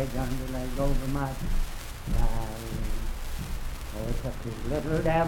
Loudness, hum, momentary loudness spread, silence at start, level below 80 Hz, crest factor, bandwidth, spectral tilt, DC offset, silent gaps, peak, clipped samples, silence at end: -33 LUFS; none; 8 LU; 0 s; -30 dBFS; 16 dB; 17 kHz; -6 dB/octave; under 0.1%; none; -12 dBFS; under 0.1%; 0 s